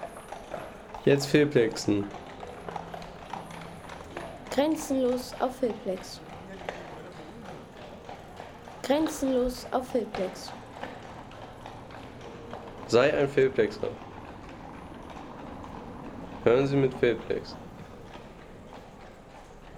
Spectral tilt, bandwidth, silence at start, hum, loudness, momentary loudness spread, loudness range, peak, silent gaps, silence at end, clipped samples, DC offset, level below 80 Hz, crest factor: -5.5 dB/octave; 18 kHz; 0 s; none; -28 LUFS; 20 LU; 7 LU; -8 dBFS; none; 0 s; under 0.1%; under 0.1%; -54 dBFS; 22 dB